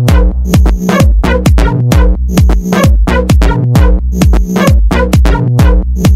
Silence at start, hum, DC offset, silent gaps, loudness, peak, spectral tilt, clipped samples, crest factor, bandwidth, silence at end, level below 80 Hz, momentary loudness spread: 0 s; none; under 0.1%; none; -9 LUFS; 0 dBFS; -6.5 dB/octave; 0.6%; 6 dB; 15 kHz; 0 s; -10 dBFS; 2 LU